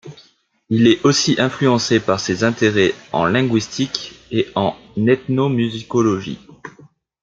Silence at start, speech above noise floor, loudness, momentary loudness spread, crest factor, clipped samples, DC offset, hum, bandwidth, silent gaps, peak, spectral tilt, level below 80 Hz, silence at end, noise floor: 0.05 s; 38 dB; -17 LUFS; 8 LU; 16 dB; under 0.1%; under 0.1%; none; 9 kHz; none; -2 dBFS; -5 dB/octave; -56 dBFS; 0.55 s; -55 dBFS